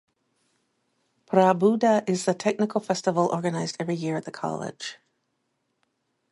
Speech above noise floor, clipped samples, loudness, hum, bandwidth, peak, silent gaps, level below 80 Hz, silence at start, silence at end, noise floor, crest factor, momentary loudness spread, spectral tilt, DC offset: 52 dB; under 0.1%; -25 LUFS; none; 11.5 kHz; -6 dBFS; none; -74 dBFS; 1.3 s; 1.4 s; -76 dBFS; 22 dB; 12 LU; -5.5 dB/octave; under 0.1%